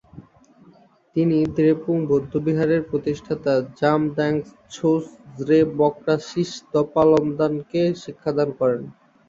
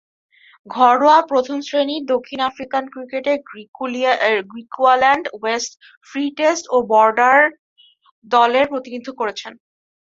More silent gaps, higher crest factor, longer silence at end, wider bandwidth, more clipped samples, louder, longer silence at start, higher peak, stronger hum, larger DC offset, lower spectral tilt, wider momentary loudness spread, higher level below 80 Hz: second, none vs 3.68-3.73 s, 5.97-6.01 s, 7.59-7.76 s, 8.12-8.22 s; about the same, 18 dB vs 18 dB; second, 0.35 s vs 0.55 s; about the same, 7.6 kHz vs 7.8 kHz; neither; second, -21 LUFS vs -17 LUFS; second, 0.15 s vs 0.7 s; about the same, -4 dBFS vs -2 dBFS; neither; neither; first, -7.5 dB/octave vs -2.5 dB/octave; second, 9 LU vs 15 LU; first, -56 dBFS vs -64 dBFS